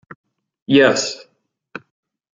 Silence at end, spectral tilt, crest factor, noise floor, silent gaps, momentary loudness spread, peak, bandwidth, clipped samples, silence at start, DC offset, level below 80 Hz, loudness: 0.55 s; -4 dB/octave; 20 dB; -39 dBFS; none; 24 LU; -2 dBFS; 9.2 kHz; under 0.1%; 0.7 s; under 0.1%; -64 dBFS; -15 LUFS